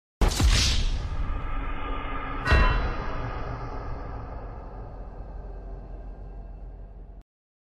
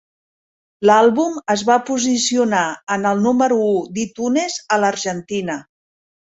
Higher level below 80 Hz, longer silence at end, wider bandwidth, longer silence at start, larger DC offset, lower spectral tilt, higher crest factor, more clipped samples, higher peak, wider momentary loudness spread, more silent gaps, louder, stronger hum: first, -30 dBFS vs -62 dBFS; second, 0.55 s vs 0.75 s; first, 14.5 kHz vs 8.2 kHz; second, 0.2 s vs 0.8 s; neither; about the same, -4 dB/octave vs -4 dB/octave; about the same, 18 dB vs 16 dB; neither; second, -10 dBFS vs -2 dBFS; first, 21 LU vs 10 LU; second, none vs 2.83-2.87 s; second, -28 LUFS vs -17 LUFS; neither